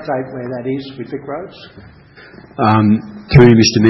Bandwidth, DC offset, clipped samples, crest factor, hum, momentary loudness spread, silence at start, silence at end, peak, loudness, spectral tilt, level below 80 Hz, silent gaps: 6 kHz; under 0.1%; 0.3%; 14 dB; none; 19 LU; 0 s; 0 s; 0 dBFS; -13 LUFS; -6.5 dB/octave; -38 dBFS; none